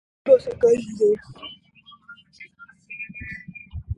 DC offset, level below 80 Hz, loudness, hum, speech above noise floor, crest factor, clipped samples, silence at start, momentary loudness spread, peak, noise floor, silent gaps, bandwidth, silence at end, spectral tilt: under 0.1%; -46 dBFS; -21 LUFS; none; 31 dB; 20 dB; under 0.1%; 0.25 s; 22 LU; -4 dBFS; -51 dBFS; none; 10.5 kHz; 0.05 s; -6 dB/octave